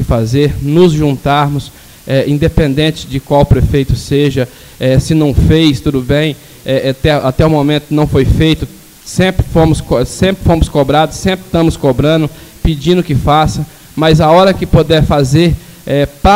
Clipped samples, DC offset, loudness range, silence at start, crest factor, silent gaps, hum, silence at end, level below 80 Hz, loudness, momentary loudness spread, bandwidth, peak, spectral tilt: under 0.1%; under 0.1%; 2 LU; 0 s; 10 dB; none; none; 0 s; -22 dBFS; -11 LUFS; 8 LU; 16.5 kHz; 0 dBFS; -6.5 dB/octave